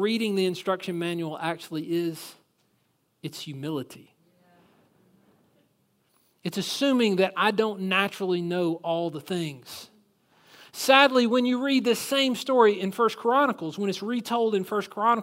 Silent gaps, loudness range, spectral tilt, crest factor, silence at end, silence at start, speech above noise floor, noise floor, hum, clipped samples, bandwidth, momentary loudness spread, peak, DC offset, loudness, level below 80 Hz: none; 18 LU; -4.5 dB/octave; 24 dB; 0 s; 0 s; 45 dB; -70 dBFS; none; under 0.1%; 16 kHz; 15 LU; -2 dBFS; under 0.1%; -25 LUFS; -78 dBFS